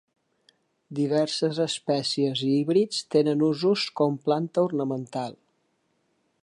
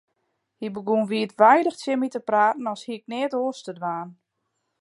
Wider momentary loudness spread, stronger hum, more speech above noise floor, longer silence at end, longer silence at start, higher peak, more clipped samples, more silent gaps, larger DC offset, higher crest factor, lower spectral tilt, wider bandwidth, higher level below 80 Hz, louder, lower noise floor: second, 8 LU vs 17 LU; neither; second, 47 dB vs 54 dB; first, 1.1 s vs 0.7 s; first, 0.9 s vs 0.6 s; second, -10 dBFS vs -4 dBFS; neither; neither; neither; about the same, 16 dB vs 20 dB; about the same, -5.5 dB/octave vs -5.5 dB/octave; about the same, 11.5 kHz vs 11.5 kHz; about the same, -76 dBFS vs -78 dBFS; about the same, -25 LUFS vs -23 LUFS; second, -72 dBFS vs -77 dBFS